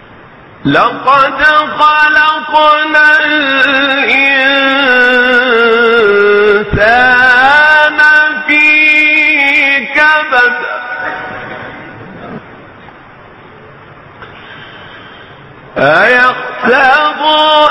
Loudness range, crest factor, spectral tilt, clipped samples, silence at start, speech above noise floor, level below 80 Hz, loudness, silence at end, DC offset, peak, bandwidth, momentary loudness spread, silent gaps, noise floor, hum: 11 LU; 10 dB; -4.5 dB/octave; 0.1%; 0.6 s; 27 dB; -40 dBFS; -7 LUFS; 0 s; under 0.1%; 0 dBFS; 11.5 kHz; 13 LU; none; -35 dBFS; none